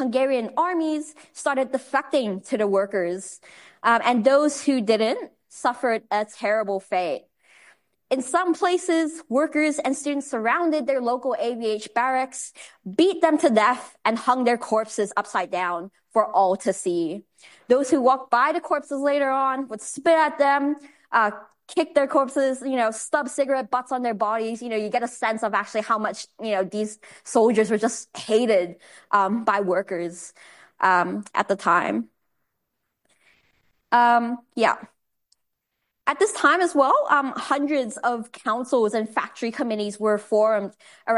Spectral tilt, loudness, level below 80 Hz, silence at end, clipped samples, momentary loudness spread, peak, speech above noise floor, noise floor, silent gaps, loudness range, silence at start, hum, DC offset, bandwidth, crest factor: -4 dB/octave; -23 LUFS; -76 dBFS; 0 s; under 0.1%; 10 LU; -4 dBFS; 56 dB; -79 dBFS; none; 3 LU; 0 s; none; under 0.1%; 11.5 kHz; 18 dB